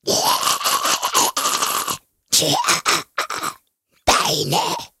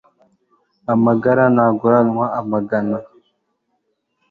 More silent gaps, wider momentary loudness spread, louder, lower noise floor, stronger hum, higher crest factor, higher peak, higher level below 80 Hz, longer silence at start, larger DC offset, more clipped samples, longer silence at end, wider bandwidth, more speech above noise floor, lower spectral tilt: neither; about the same, 9 LU vs 9 LU; about the same, -18 LUFS vs -16 LUFS; second, -63 dBFS vs -70 dBFS; neither; about the same, 18 dB vs 16 dB; about the same, -2 dBFS vs -2 dBFS; first, -48 dBFS vs -58 dBFS; second, 0.05 s vs 0.9 s; neither; neither; second, 0.15 s vs 1.25 s; first, 17 kHz vs 4.3 kHz; second, 44 dB vs 54 dB; second, -1 dB/octave vs -11 dB/octave